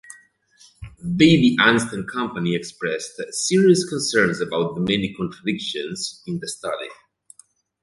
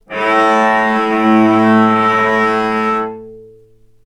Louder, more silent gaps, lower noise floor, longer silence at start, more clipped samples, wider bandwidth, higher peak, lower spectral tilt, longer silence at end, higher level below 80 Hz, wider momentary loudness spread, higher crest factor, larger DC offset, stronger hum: second, -21 LUFS vs -12 LUFS; neither; first, -55 dBFS vs -46 dBFS; about the same, 0.1 s vs 0.1 s; neither; about the same, 11.5 kHz vs 10.5 kHz; about the same, -2 dBFS vs 0 dBFS; second, -4.5 dB/octave vs -6 dB/octave; first, 0.9 s vs 0.6 s; about the same, -54 dBFS vs -54 dBFS; first, 14 LU vs 7 LU; first, 20 dB vs 14 dB; neither; neither